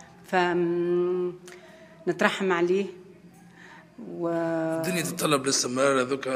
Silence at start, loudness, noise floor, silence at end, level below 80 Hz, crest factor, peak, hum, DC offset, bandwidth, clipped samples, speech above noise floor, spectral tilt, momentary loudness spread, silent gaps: 0 s; -26 LUFS; -51 dBFS; 0 s; -72 dBFS; 24 dB; -4 dBFS; none; under 0.1%; 15.5 kHz; under 0.1%; 25 dB; -4 dB/octave; 11 LU; none